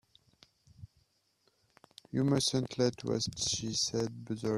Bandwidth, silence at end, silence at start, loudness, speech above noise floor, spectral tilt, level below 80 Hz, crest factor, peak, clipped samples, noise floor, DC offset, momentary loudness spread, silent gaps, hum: 14 kHz; 0 s; 0.8 s; -32 LUFS; 42 dB; -4.5 dB/octave; -64 dBFS; 20 dB; -16 dBFS; under 0.1%; -74 dBFS; under 0.1%; 8 LU; none; none